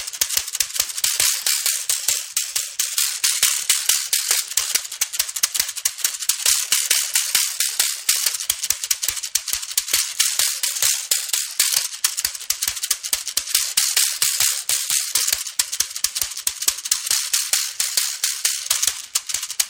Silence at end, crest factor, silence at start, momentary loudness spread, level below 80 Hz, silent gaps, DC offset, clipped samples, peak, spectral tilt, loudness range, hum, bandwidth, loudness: 0 s; 22 dB; 0 s; 5 LU; -60 dBFS; none; under 0.1%; under 0.1%; 0 dBFS; 4 dB/octave; 1 LU; none; 17 kHz; -19 LUFS